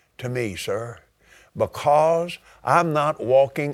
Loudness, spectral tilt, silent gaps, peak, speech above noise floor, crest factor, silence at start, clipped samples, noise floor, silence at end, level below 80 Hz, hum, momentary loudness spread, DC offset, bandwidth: -22 LUFS; -5.5 dB/octave; none; -2 dBFS; 31 dB; 20 dB; 0.2 s; under 0.1%; -53 dBFS; 0 s; -58 dBFS; none; 13 LU; under 0.1%; 15.5 kHz